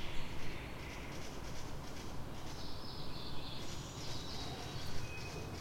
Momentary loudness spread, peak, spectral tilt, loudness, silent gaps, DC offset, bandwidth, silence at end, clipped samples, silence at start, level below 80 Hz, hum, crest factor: 4 LU; -24 dBFS; -4 dB/octave; -46 LUFS; none; under 0.1%; 16.5 kHz; 0 s; under 0.1%; 0 s; -50 dBFS; none; 16 dB